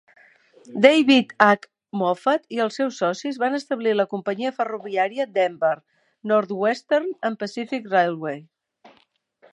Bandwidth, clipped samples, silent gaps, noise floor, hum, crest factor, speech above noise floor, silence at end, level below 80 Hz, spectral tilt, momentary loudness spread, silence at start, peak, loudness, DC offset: 10.5 kHz; under 0.1%; none; -63 dBFS; none; 22 dB; 41 dB; 1.1 s; -74 dBFS; -5 dB/octave; 13 LU; 0.7 s; 0 dBFS; -22 LUFS; under 0.1%